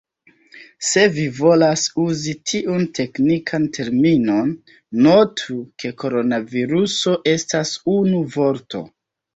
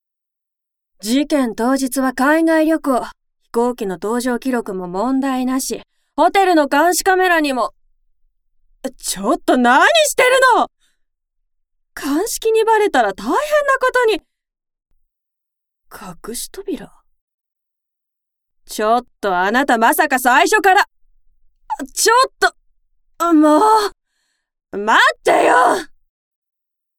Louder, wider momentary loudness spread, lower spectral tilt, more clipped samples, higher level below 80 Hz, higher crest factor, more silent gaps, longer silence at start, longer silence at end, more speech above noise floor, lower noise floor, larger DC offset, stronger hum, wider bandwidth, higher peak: second, -18 LUFS vs -15 LUFS; second, 12 LU vs 15 LU; first, -5 dB/octave vs -2.5 dB/octave; neither; second, -58 dBFS vs -50 dBFS; about the same, 16 dB vs 18 dB; second, none vs 17.21-17.28 s, 17.34-17.38 s; second, 0.55 s vs 1.05 s; second, 0.5 s vs 1.15 s; second, 37 dB vs 67 dB; second, -55 dBFS vs -82 dBFS; neither; neither; second, 8.4 kHz vs 19 kHz; about the same, -2 dBFS vs 0 dBFS